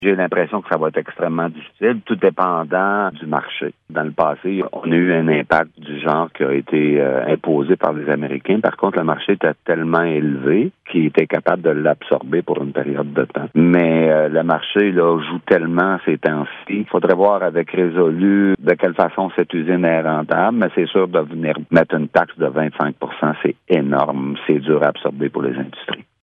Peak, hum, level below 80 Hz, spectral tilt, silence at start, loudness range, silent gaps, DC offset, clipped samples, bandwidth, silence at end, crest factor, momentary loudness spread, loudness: 0 dBFS; none; -62 dBFS; -9 dB/octave; 0 s; 3 LU; none; under 0.1%; under 0.1%; 5.4 kHz; 0.2 s; 16 dB; 7 LU; -17 LUFS